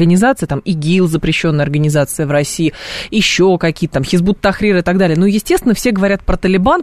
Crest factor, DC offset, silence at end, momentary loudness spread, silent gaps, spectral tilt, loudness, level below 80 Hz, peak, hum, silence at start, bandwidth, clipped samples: 12 dB; 0.7%; 0 s; 6 LU; none; -5.5 dB/octave; -13 LUFS; -30 dBFS; 0 dBFS; none; 0 s; 13.5 kHz; under 0.1%